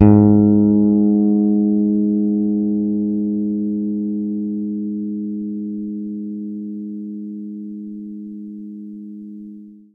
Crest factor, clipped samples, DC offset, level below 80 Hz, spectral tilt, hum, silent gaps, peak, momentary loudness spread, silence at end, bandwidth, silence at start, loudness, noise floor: 18 dB; under 0.1%; under 0.1%; -48 dBFS; -14.5 dB/octave; none; none; 0 dBFS; 19 LU; 0.15 s; 2.6 kHz; 0 s; -18 LUFS; -38 dBFS